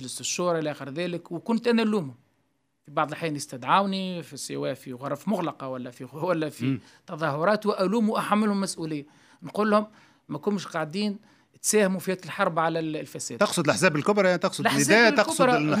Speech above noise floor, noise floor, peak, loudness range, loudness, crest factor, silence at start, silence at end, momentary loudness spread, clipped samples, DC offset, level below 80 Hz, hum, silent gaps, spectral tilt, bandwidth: 47 dB; -73 dBFS; -4 dBFS; 7 LU; -25 LUFS; 22 dB; 0 s; 0 s; 13 LU; under 0.1%; under 0.1%; -74 dBFS; none; none; -4.5 dB/octave; 16 kHz